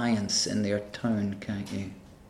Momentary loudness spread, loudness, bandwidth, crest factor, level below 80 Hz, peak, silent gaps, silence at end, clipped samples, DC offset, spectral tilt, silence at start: 11 LU; -29 LUFS; 14 kHz; 16 dB; -60 dBFS; -14 dBFS; none; 0 s; under 0.1%; under 0.1%; -4 dB/octave; 0 s